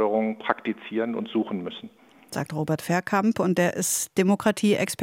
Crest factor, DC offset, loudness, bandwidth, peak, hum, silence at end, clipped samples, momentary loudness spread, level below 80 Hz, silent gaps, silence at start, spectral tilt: 22 dB; under 0.1%; -25 LUFS; 16.5 kHz; -4 dBFS; none; 0 s; under 0.1%; 10 LU; -68 dBFS; none; 0 s; -4.5 dB/octave